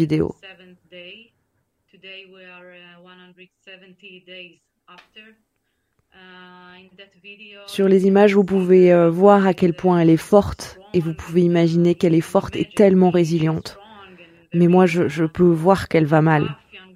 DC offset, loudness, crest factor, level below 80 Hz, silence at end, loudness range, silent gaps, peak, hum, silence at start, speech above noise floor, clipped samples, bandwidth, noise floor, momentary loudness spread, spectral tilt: under 0.1%; -17 LUFS; 18 dB; -50 dBFS; 0.15 s; 6 LU; none; -2 dBFS; none; 0 s; 54 dB; under 0.1%; 14 kHz; -72 dBFS; 25 LU; -7.5 dB/octave